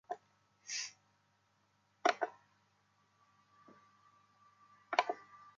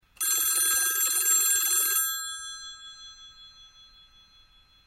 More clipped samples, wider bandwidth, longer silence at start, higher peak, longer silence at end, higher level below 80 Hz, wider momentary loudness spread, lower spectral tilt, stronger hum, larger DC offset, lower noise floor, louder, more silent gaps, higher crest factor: neither; second, 9.2 kHz vs 16 kHz; about the same, 0.1 s vs 0.2 s; about the same, -12 dBFS vs -12 dBFS; second, 0.1 s vs 1.2 s; second, under -90 dBFS vs -66 dBFS; second, 14 LU vs 22 LU; first, -0.5 dB/octave vs 3.5 dB/octave; first, 50 Hz at -80 dBFS vs none; neither; first, -76 dBFS vs -59 dBFS; second, -39 LUFS vs -22 LUFS; neither; first, 32 dB vs 16 dB